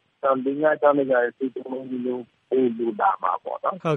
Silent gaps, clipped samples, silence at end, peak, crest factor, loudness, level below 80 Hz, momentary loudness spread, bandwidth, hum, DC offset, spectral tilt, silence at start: none; under 0.1%; 0 s; -6 dBFS; 18 dB; -23 LUFS; -74 dBFS; 11 LU; 6.6 kHz; none; under 0.1%; -8 dB/octave; 0.25 s